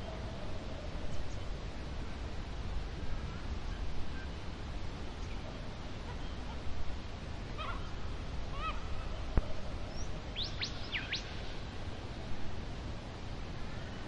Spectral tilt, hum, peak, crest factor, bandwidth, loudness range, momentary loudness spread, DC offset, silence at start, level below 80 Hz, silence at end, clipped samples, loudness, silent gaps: -5 dB/octave; none; -14 dBFS; 24 dB; 9 kHz; 4 LU; 6 LU; 0.1%; 0 s; -42 dBFS; 0 s; under 0.1%; -42 LUFS; none